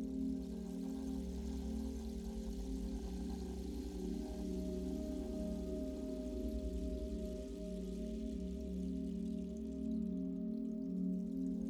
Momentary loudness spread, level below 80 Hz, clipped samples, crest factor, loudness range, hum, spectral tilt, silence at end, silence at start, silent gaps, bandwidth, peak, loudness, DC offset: 4 LU; -48 dBFS; under 0.1%; 12 dB; 2 LU; none; -8 dB/octave; 0 s; 0 s; none; 14.5 kHz; -30 dBFS; -43 LUFS; under 0.1%